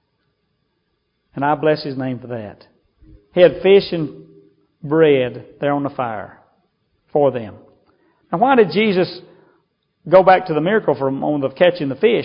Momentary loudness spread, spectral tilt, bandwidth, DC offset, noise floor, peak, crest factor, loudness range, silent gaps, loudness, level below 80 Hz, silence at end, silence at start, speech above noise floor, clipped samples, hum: 17 LU; -10 dB/octave; 5.4 kHz; under 0.1%; -69 dBFS; 0 dBFS; 18 dB; 5 LU; none; -17 LUFS; -56 dBFS; 0 s; 1.35 s; 53 dB; under 0.1%; none